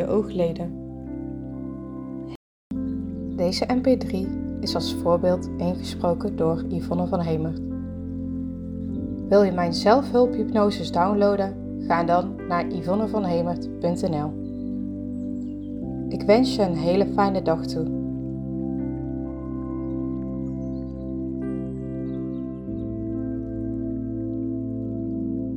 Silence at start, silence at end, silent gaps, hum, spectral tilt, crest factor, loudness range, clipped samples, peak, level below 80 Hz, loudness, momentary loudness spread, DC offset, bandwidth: 0 s; 0 s; 2.36-2.70 s; none; -7 dB/octave; 22 dB; 8 LU; under 0.1%; -4 dBFS; -44 dBFS; -25 LUFS; 12 LU; under 0.1%; 14 kHz